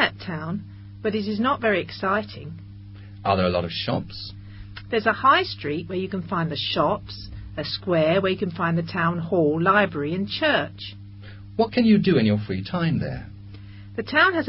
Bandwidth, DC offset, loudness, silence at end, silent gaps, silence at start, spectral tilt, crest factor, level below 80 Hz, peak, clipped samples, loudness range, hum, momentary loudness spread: 5.8 kHz; under 0.1%; -23 LUFS; 0 s; none; 0 s; -10.5 dB/octave; 20 dB; -48 dBFS; -4 dBFS; under 0.1%; 4 LU; none; 22 LU